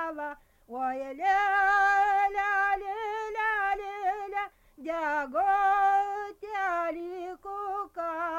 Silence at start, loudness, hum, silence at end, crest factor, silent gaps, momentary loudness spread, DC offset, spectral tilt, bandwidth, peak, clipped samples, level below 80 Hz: 0 s; -28 LUFS; none; 0 s; 14 dB; none; 14 LU; under 0.1%; -3 dB/octave; 14 kHz; -14 dBFS; under 0.1%; -60 dBFS